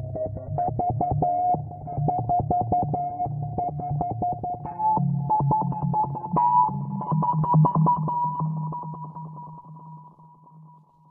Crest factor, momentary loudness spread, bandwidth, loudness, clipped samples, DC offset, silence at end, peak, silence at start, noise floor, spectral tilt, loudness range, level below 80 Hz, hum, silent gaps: 16 dB; 16 LU; 2.3 kHz; -25 LUFS; under 0.1%; under 0.1%; 0.45 s; -10 dBFS; 0 s; -52 dBFS; -14.5 dB/octave; 4 LU; -48 dBFS; none; none